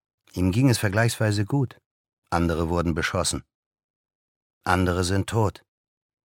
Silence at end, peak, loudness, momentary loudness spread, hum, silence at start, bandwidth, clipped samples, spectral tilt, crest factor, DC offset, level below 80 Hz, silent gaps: 0.75 s; -4 dBFS; -24 LUFS; 8 LU; none; 0.35 s; 17 kHz; under 0.1%; -5.5 dB/octave; 22 dB; under 0.1%; -44 dBFS; 1.86-2.04 s, 2.13-2.22 s, 3.55-3.71 s, 3.84-4.04 s, 4.15-4.61 s